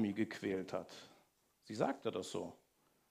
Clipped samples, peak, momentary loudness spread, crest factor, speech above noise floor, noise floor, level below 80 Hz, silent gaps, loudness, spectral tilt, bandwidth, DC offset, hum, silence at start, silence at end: under 0.1%; -20 dBFS; 16 LU; 22 dB; 32 dB; -74 dBFS; -82 dBFS; none; -42 LUFS; -5.5 dB/octave; 15.5 kHz; under 0.1%; none; 0 s; 0.55 s